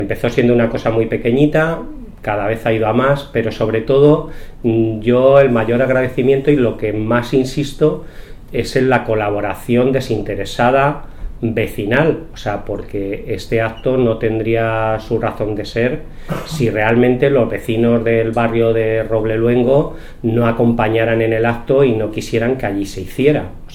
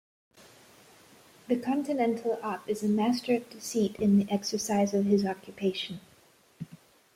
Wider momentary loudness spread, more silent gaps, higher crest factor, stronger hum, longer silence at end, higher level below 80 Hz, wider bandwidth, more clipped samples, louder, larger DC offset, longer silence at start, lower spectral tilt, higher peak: second, 10 LU vs 13 LU; neither; about the same, 16 dB vs 16 dB; neither; second, 0 s vs 0.4 s; first, -32 dBFS vs -68 dBFS; about the same, 16.5 kHz vs 15.5 kHz; neither; first, -16 LUFS vs -29 LUFS; neither; second, 0 s vs 1.5 s; first, -7.5 dB/octave vs -5.5 dB/octave; first, 0 dBFS vs -14 dBFS